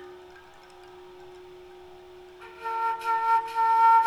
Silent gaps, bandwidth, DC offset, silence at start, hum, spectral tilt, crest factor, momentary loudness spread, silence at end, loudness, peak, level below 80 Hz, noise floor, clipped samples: none; 12.5 kHz; under 0.1%; 0 s; none; -3 dB/octave; 16 dB; 26 LU; 0 s; -25 LUFS; -10 dBFS; -68 dBFS; -50 dBFS; under 0.1%